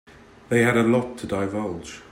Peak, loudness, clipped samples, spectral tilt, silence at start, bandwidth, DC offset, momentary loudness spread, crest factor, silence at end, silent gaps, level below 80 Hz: -8 dBFS; -23 LUFS; under 0.1%; -6 dB/octave; 0.5 s; 16 kHz; under 0.1%; 12 LU; 16 dB; 0.1 s; none; -54 dBFS